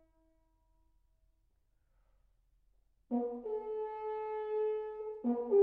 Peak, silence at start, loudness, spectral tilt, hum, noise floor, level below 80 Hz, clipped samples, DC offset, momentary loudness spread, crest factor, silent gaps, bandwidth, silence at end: -18 dBFS; 3.1 s; -38 LUFS; -6 dB/octave; none; -74 dBFS; -72 dBFS; under 0.1%; under 0.1%; 5 LU; 20 dB; none; 3.6 kHz; 0 s